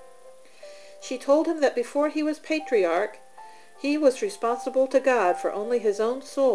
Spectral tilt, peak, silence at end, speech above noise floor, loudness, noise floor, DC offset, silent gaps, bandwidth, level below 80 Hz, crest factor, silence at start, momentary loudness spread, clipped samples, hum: -3.5 dB/octave; -8 dBFS; 0 s; 28 dB; -25 LUFS; -51 dBFS; 0.3%; none; 11 kHz; -80 dBFS; 16 dB; 0.25 s; 10 LU; under 0.1%; none